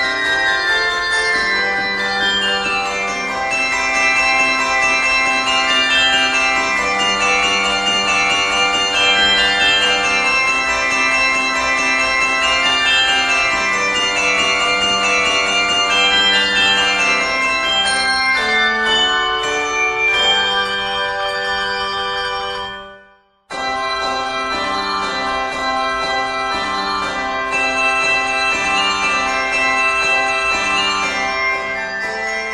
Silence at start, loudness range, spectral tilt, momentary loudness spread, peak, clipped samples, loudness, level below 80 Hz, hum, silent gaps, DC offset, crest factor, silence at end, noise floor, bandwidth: 0 s; 6 LU; -0.5 dB/octave; 7 LU; -2 dBFS; under 0.1%; -14 LUFS; -44 dBFS; none; none; under 0.1%; 14 dB; 0 s; -50 dBFS; 13 kHz